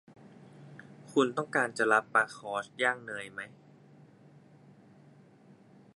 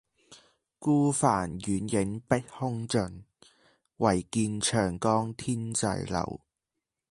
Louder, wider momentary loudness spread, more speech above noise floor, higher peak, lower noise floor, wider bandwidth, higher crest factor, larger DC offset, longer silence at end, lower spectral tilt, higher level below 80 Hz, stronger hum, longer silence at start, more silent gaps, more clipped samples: about the same, -30 LUFS vs -29 LUFS; first, 25 LU vs 8 LU; second, 28 dB vs 59 dB; about the same, -10 dBFS vs -8 dBFS; second, -58 dBFS vs -87 dBFS; about the same, 11.5 kHz vs 11.5 kHz; about the same, 24 dB vs 20 dB; neither; first, 2.5 s vs 0.75 s; about the same, -4 dB/octave vs -5 dB/octave; second, -84 dBFS vs -54 dBFS; neither; first, 0.55 s vs 0.3 s; neither; neither